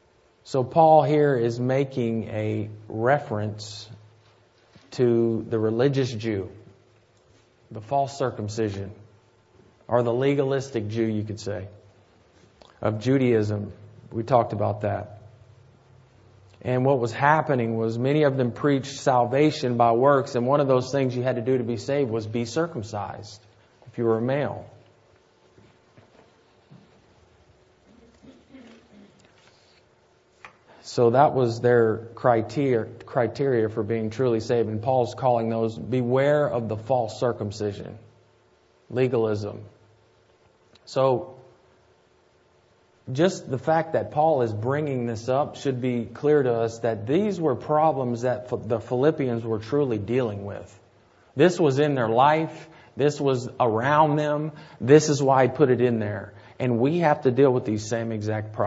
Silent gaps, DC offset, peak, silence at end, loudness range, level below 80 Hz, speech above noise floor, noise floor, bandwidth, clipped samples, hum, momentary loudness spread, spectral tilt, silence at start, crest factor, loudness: none; under 0.1%; -2 dBFS; 0 s; 8 LU; -64 dBFS; 38 dB; -61 dBFS; 8 kHz; under 0.1%; none; 13 LU; -7 dB/octave; 0.45 s; 22 dB; -24 LUFS